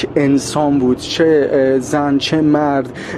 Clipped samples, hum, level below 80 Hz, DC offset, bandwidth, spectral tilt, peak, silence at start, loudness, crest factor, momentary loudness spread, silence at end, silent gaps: under 0.1%; none; -44 dBFS; under 0.1%; 14 kHz; -5.5 dB/octave; -2 dBFS; 0 s; -14 LUFS; 12 dB; 3 LU; 0 s; none